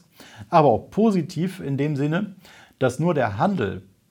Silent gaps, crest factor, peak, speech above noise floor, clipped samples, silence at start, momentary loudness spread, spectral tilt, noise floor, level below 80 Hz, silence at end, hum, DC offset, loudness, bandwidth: none; 20 dB; -2 dBFS; 23 dB; under 0.1%; 0.2 s; 10 LU; -7.5 dB/octave; -44 dBFS; -58 dBFS; 0.3 s; none; under 0.1%; -22 LUFS; 16.5 kHz